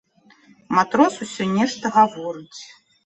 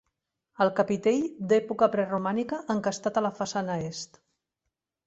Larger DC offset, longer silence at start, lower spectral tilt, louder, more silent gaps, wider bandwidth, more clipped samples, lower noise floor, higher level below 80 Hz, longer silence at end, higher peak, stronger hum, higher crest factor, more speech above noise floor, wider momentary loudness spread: neither; about the same, 0.7 s vs 0.6 s; about the same, -5 dB/octave vs -5.5 dB/octave; first, -20 LUFS vs -27 LUFS; neither; about the same, 8.6 kHz vs 8.2 kHz; neither; second, -54 dBFS vs -85 dBFS; about the same, -64 dBFS vs -68 dBFS; second, 0.4 s vs 1 s; first, -2 dBFS vs -8 dBFS; neither; about the same, 20 dB vs 20 dB; second, 34 dB vs 58 dB; first, 17 LU vs 7 LU